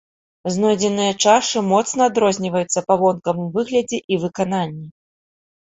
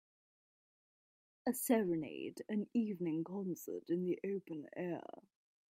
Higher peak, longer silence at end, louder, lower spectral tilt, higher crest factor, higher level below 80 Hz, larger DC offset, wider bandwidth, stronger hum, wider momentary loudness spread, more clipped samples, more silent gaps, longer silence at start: first, -2 dBFS vs -20 dBFS; about the same, 0.7 s vs 0.7 s; first, -19 LUFS vs -40 LUFS; second, -4 dB/octave vs -6 dB/octave; about the same, 18 dB vs 20 dB; first, -60 dBFS vs -84 dBFS; neither; second, 8.2 kHz vs 15.5 kHz; neither; second, 8 LU vs 11 LU; neither; first, 4.04-4.09 s vs none; second, 0.45 s vs 1.45 s